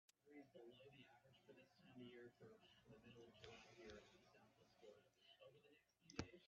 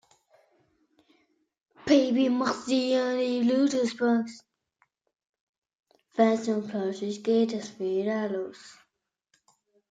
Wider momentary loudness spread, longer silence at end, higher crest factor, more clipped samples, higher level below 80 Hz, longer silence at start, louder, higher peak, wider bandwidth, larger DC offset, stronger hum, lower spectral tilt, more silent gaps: about the same, 11 LU vs 9 LU; second, 0 s vs 1.2 s; first, 32 dB vs 20 dB; neither; second, -82 dBFS vs -74 dBFS; second, 0.1 s vs 1.85 s; second, -64 LUFS vs -26 LUFS; second, -34 dBFS vs -8 dBFS; second, 7.2 kHz vs 9.2 kHz; neither; neither; about the same, -4 dB/octave vs -5 dB/octave; second, none vs 5.29-5.33 s, 5.40-5.62 s